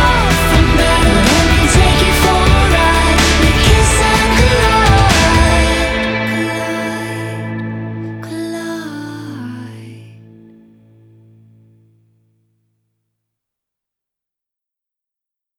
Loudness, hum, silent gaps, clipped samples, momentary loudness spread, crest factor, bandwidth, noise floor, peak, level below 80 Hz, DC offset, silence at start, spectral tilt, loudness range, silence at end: -12 LUFS; none; none; under 0.1%; 15 LU; 14 dB; 18 kHz; -85 dBFS; 0 dBFS; -20 dBFS; under 0.1%; 0 s; -4.5 dB/octave; 17 LU; 5.55 s